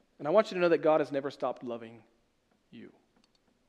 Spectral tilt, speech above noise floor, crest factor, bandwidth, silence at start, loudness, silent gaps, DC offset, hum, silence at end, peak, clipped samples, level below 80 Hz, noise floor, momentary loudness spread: -6.5 dB/octave; 42 dB; 22 dB; 9.2 kHz; 0.2 s; -29 LUFS; none; under 0.1%; none; 0.8 s; -10 dBFS; under 0.1%; -80 dBFS; -72 dBFS; 16 LU